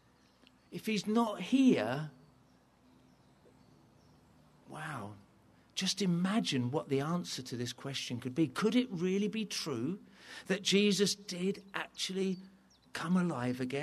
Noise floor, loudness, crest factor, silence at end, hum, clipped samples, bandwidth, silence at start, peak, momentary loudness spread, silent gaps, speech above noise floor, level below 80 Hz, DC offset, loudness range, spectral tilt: -66 dBFS; -34 LUFS; 18 dB; 0 s; none; under 0.1%; 13.5 kHz; 0.7 s; -16 dBFS; 15 LU; none; 32 dB; -76 dBFS; under 0.1%; 11 LU; -5 dB/octave